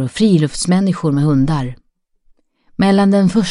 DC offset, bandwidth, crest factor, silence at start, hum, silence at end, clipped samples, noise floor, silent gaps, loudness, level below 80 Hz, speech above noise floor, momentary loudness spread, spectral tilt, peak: under 0.1%; 11 kHz; 14 dB; 0 s; none; 0 s; under 0.1%; -54 dBFS; none; -14 LUFS; -38 dBFS; 41 dB; 8 LU; -6.5 dB/octave; -2 dBFS